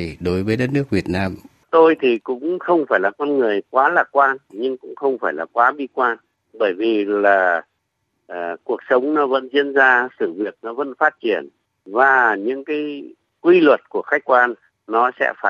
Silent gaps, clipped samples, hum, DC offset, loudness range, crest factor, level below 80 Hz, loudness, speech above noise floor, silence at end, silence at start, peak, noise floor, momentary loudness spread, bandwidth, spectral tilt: none; under 0.1%; none; under 0.1%; 3 LU; 18 dB; -58 dBFS; -18 LUFS; 54 dB; 0 s; 0 s; 0 dBFS; -72 dBFS; 12 LU; 9.8 kHz; -7 dB/octave